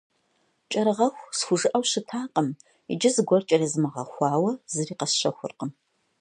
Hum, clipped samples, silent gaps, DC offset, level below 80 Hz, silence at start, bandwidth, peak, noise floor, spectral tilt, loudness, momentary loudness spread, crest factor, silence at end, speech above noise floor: none; under 0.1%; none; under 0.1%; -76 dBFS; 0.7 s; 11 kHz; -6 dBFS; -70 dBFS; -4 dB/octave; -25 LUFS; 11 LU; 20 dB; 0.5 s; 45 dB